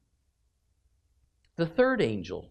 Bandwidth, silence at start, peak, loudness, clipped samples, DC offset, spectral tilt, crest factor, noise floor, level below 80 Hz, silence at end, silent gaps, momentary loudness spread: 8.8 kHz; 1.6 s; -12 dBFS; -28 LUFS; under 0.1%; under 0.1%; -7 dB/octave; 20 dB; -73 dBFS; -60 dBFS; 0.05 s; none; 12 LU